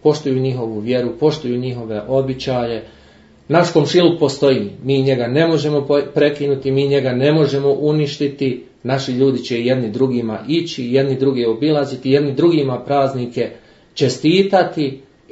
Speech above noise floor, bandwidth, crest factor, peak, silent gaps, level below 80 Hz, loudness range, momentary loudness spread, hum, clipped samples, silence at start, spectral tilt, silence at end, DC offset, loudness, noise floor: 30 dB; 8 kHz; 16 dB; 0 dBFS; none; -54 dBFS; 3 LU; 8 LU; none; under 0.1%; 0.05 s; -6.5 dB/octave; 0.3 s; under 0.1%; -17 LUFS; -47 dBFS